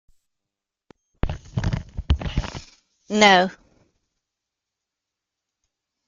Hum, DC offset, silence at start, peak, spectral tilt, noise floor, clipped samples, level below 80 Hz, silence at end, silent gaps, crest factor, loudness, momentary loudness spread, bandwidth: none; under 0.1%; 1.25 s; -2 dBFS; -4.5 dB/octave; -85 dBFS; under 0.1%; -36 dBFS; 2.55 s; none; 24 dB; -21 LUFS; 17 LU; 9.2 kHz